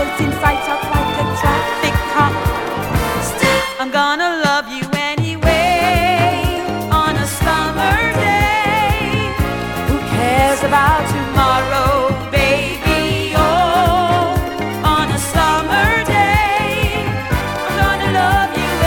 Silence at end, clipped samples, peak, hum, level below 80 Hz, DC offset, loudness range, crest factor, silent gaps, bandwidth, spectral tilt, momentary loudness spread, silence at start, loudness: 0 s; under 0.1%; 0 dBFS; none; -26 dBFS; under 0.1%; 2 LU; 16 dB; none; 19.5 kHz; -4.5 dB/octave; 6 LU; 0 s; -15 LUFS